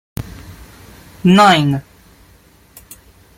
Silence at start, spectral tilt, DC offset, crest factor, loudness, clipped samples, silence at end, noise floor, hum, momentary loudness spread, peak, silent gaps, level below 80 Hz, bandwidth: 0.2 s; -5.5 dB/octave; under 0.1%; 18 dB; -12 LUFS; under 0.1%; 1.55 s; -48 dBFS; none; 24 LU; 0 dBFS; none; -44 dBFS; 17 kHz